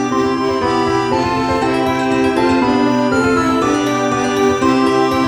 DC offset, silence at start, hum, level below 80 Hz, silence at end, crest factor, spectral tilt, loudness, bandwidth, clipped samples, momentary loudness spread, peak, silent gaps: under 0.1%; 0 s; none; -40 dBFS; 0 s; 14 dB; -5 dB/octave; -15 LUFS; over 20 kHz; under 0.1%; 2 LU; 0 dBFS; none